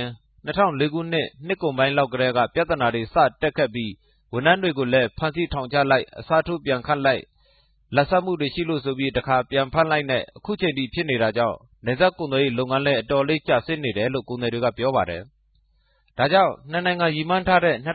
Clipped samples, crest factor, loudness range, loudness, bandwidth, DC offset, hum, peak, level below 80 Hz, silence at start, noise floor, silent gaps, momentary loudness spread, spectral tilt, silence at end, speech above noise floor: under 0.1%; 20 dB; 2 LU; -22 LUFS; 4.8 kHz; under 0.1%; none; -2 dBFS; -48 dBFS; 0 s; -63 dBFS; none; 7 LU; -10.5 dB/octave; 0 s; 41 dB